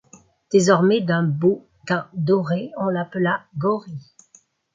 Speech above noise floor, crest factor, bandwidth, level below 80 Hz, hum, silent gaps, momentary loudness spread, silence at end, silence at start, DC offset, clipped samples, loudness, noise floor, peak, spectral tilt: 36 dB; 18 dB; 9.4 kHz; -66 dBFS; none; none; 10 LU; 0.75 s; 0.5 s; under 0.1%; under 0.1%; -21 LUFS; -56 dBFS; -2 dBFS; -6 dB/octave